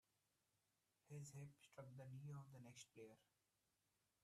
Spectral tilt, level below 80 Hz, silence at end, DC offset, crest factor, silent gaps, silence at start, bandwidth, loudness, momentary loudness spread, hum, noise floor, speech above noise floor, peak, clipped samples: -5.5 dB/octave; under -90 dBFS; 1 s; under 0.1%; 16 dB; none; 1.05 s; 13.5 kHz; -61 LUFS; 6 LU; none; -89 dBFS; 29 dB; -46 dBFS; under 0.1%